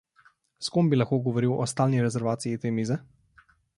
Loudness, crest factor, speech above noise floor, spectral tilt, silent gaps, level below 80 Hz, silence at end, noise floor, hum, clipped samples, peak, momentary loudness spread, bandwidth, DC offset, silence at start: -26 LUFS; 18 dB; 37 dB; -6.5 dB/octave; none; -64 dBFS; 0.75 s; -62 dBFS; none; under 0.1%; -10 dBFS; 7 LU; 11.5 kHz; under 0.1%; 0.6 s